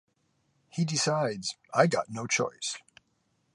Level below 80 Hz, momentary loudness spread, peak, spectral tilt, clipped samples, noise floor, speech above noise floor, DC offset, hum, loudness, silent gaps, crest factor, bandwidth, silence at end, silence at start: -74 dBFS; 10 LU; -8 dBFS; -4 dB/octave; under 0.1%; -73 dBFS; 45 dB; under 0.1%; none; -29 LUFS; none; 24 dB; 11.5 kHz; 0.75 s; 0.75 s